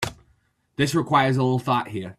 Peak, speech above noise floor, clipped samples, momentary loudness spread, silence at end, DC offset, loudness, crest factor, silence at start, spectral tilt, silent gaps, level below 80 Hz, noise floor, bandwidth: -4 dBFS; 43 dB; under 0.1%; 10 LU; 0.05 s; under 0.1%; -22 LUFS; 18 dB; 0 s; -6 dB/octave; none; -56 dBFS; -64 dBFS; 14 kHz